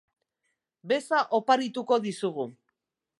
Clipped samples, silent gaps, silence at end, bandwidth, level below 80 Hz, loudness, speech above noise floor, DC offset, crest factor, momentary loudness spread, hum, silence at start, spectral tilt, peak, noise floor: under 0.1%; none; 0.7 s; 11.5 kHz; -84 dBFS; -27 LUFS; 55 dB; under 0.1%; 22 dB; 9 LU; none; 0.85 s; -4.5 dB/octave; -8 dBFS; -81 dBFS